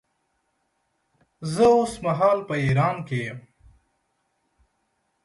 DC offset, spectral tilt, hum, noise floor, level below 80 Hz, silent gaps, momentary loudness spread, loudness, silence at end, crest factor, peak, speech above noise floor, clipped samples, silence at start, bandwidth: under 0.1%; -6.5 dB/octave; none; -73 dBFS; -56 dBFS; none; 16 LU; -22 LUFS; 1.85 s; 18 dB; -6 dBFS; 51 dB; under 0.1%; 1.4 s; 11.5 kHz